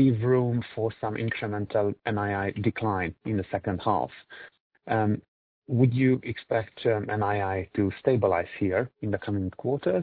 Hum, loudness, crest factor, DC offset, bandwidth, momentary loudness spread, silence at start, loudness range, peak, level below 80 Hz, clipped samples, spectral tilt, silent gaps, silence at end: none; -28 LUFS; 18 dB; under 0.1%; 4.7 kHz; 7 LU; 0 s; 3 LU; -8 dBFS; -58 dBFS; under 0.1%; -11.5 dB/octave; 4.60-4.70 s, 5.28-5.62 s; 0 s